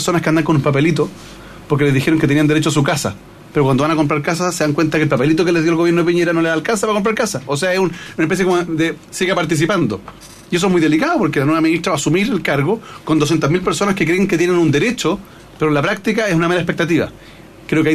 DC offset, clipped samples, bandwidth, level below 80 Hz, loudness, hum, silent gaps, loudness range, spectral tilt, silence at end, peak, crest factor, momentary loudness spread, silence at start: under 0.1%; under 0.1%; 14 kHz; -46 dBFS; -16 LUFS; none; none; 2 LU; -5.5 dB/octave; 0 s; -2 dBFS; 14 dB; 7 LU; 0 s